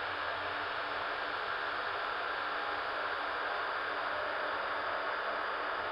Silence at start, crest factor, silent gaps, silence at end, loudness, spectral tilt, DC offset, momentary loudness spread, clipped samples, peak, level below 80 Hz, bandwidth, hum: 0 s; 12 dB; none; 0 s; -35 LUFS; -4 dB/octave; under 0.1%; 1 LU; under 0.1%; -24 dBFS; -68 dBFS; 11 kHz; none